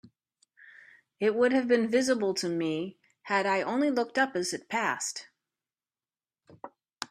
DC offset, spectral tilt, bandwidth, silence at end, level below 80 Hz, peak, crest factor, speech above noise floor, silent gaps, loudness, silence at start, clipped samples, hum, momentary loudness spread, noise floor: under 0.1%; -3.5 dB/octave; 14 kHz; 0.05 s; -76 dBFS; -12 dBFS; 18 dB; over 62 dB; none; -28 LUFS; 0.65 s; under 0.1%; none; 17 LU; under -90 dBFS